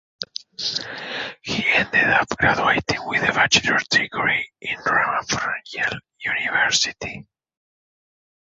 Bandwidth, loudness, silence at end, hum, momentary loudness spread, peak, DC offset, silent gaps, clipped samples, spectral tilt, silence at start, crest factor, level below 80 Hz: 8.2 kHz; -20 LUFS; 1.25 s; none; 12 LU; -2 dBFS; under 0.1%; none; under 0.1%; -2 dB/octave; 0.2 s; 20 dB; -52 dBFS